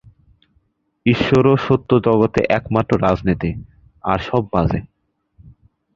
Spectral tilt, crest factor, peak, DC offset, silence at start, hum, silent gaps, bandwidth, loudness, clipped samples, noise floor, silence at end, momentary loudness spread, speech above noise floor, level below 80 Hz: -8 dB/octave; 18 dB; 0 dBFS; under 0.1%; 1.05 s; none; none; 7.6 kHz; -17 LUFS; under 0.1%; -63 dBFS; 0.45 s; 9 LU; 47 dB; -38 dBFS